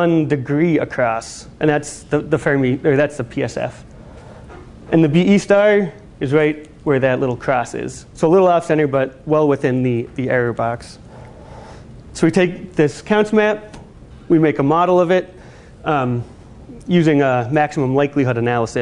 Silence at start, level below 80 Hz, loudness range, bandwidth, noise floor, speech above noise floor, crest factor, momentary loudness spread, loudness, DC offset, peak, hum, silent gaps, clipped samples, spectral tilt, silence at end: 0 s; -46 dBFS; 3 LU; 11 kHz; -39 dBFS; 23 dB; 16 dB; 12 LU; -17 LUFS; under 0.1%; -2 dBFS; none; none; under 0.1%; -7 dB/octave; 0 s